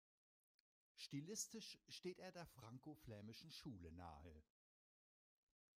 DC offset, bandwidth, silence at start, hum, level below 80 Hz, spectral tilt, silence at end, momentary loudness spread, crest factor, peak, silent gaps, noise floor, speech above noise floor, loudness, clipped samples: under 0.1%; 15.5 kHz; 0.95 s; none; -78 dBFS; -3.5 dB/octave; 1.35 s; 10 LU; 24 dB; -36 dBFS; none; under -90 dBFS; over 33 dB; -56 LUFS; under 0.1%